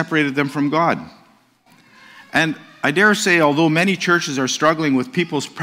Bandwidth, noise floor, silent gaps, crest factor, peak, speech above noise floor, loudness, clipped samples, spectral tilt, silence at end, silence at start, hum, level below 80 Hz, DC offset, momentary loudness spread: 16 kHz; -54 dBFS; none; 16 dB; -2 dBFS; 37 dB; -17 LUFS; under 0.1%; -4.5 dB/octave; 0 s; 0 s; none; -64 dBFS; under 0.1%; 7 LU